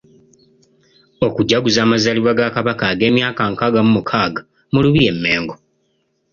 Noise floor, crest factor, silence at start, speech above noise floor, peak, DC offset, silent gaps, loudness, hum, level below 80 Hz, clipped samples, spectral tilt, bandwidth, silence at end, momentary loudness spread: -65 dBFS; 16 dB; 1.2 s; 50 dB; 0 dBFS; under 0.1%; none; -15 LUFS; none; -46 dBFS; under 0.1%; -5.5 dB/octave; 7.2 kHz; 0.75 s; 7 LU